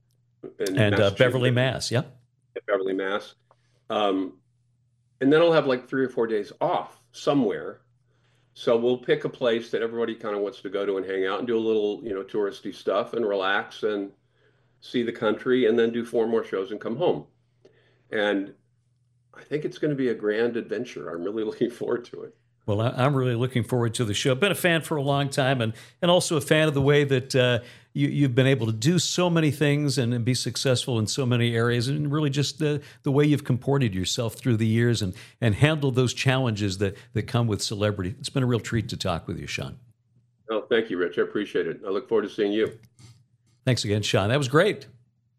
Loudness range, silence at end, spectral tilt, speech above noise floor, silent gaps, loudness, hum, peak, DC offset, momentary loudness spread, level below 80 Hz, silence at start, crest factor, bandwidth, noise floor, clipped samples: 6 LU; 0.55 s; -5.5 dB/octave; 43 dB; none; -25 LUFS; none; -2 dBFS; under 0.1%; 10 LU; -60 dBFS; 0.45 s; 22 dB; 14.5 kHz; -67 dBFS; under 0.1%